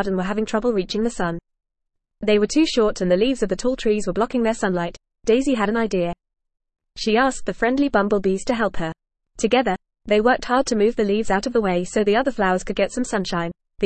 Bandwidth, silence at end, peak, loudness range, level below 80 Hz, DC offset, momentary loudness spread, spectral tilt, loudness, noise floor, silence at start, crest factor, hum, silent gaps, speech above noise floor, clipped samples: 8.8 kHz; 0 s; -4 dBFS; 2 LU; -42 dBFS; 0.4%; 8 LU; -5 dB/octave; -21 LUFS; -40 dBFS; 0 s; 16 dB; none; none; 20 dB; under 0.1%